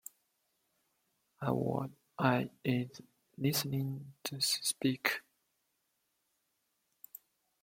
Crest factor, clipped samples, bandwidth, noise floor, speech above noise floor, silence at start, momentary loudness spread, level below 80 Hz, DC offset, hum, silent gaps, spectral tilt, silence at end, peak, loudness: 26 dB; under 0.1%; 16.5 kHz; -81 dBFS; 46 dB; 1.4 s; 19 LU; -74 dBFS; under 0.1%; none; none; -4 dB/octave; 2.45 s; -12 dBFS; -35 LUFS